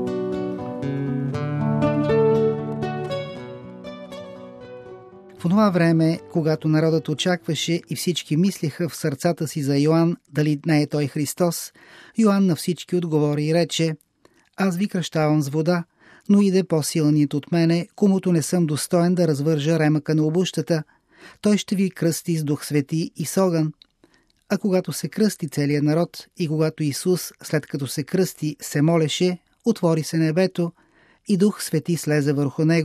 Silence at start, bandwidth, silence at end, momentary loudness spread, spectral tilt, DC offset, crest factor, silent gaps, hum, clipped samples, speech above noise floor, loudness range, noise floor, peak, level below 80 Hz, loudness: 0 s; 15 kHz; 0 s; 10 LU; -6 dB/octave; under 0.1%; 16 dB; none; none; under 0.1%; 39 dB; 4 LU; -59 dBFS; -6 dBFS; -60 dBFS; -22 LUFS